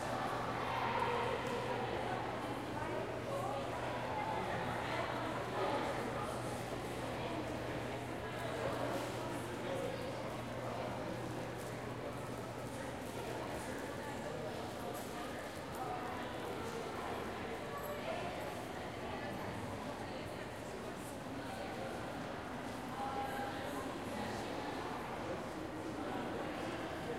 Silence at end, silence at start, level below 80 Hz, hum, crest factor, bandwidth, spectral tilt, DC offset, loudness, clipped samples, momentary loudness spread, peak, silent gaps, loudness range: 0 s; 0 s; -60 dBFS; none; 18 dB; 16 kHz; -5 dB/octave; under 0.1%; -42 LUFS; under 0.1%; 5 LU; -24 dBFS; none; 4 LU